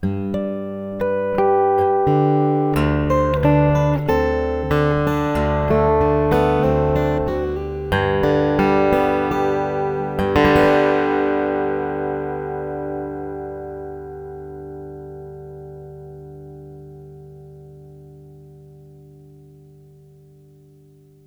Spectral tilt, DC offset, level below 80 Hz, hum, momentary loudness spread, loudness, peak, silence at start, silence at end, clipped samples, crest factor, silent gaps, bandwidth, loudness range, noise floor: -8 dB/octave; under 0.1%; -34 dBFS; 50 Hz at -55 dBFS; 20 LU; -19 LUFS; -2 dBFS; 0 s; 2.4 s; under 0.1%; 18 dB; none; over 20 kHz; 19 LU; -49 dBFS